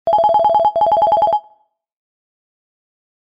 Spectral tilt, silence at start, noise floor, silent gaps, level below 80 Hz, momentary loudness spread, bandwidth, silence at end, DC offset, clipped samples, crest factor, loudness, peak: -6 dB/octave; 0.05 s; -56 dBFS; none; -54 dBFS; 4 LU; 5.2 kHz; 1.95 s; under 0.1%; under 0.1%; 12 dB; -14 LUFS; -6 dBFS